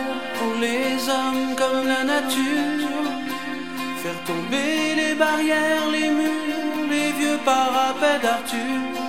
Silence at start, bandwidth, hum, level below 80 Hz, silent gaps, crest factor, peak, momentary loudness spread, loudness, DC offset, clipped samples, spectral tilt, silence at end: 0 s; 16 kHz; none; -68 dBFS; none; 18 dB; -4 dBFS; 8 LU; -22 LUFS; 0.9%; under 0.1%; -3 dB/octave; 0 s